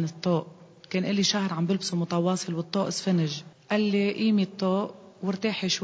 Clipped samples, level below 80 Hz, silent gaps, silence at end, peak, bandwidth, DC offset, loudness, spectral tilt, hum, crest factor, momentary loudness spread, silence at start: under 0.1%; -70 dBFS; none; 0 s; -12 dBFS; 8 kHz; under 0.1%; -27 LUFS; -5 dB/octave; none; 16 dB; 8 LU; 0 s